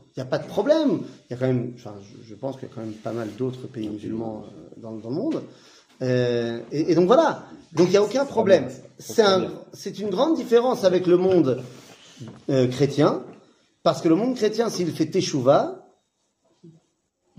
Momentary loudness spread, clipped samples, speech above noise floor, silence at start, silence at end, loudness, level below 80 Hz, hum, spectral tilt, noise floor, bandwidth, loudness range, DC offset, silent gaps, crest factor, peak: 17 LU; under 0.1%; 48 dB; 0.15 s; 0.7 s; -22 LUFS; -66 dBFS; none; -6 dB/octave; -71 dBFS; 15.5 kHz; 10 LU; under 0.1%; none; 20 dB; -4 dBFS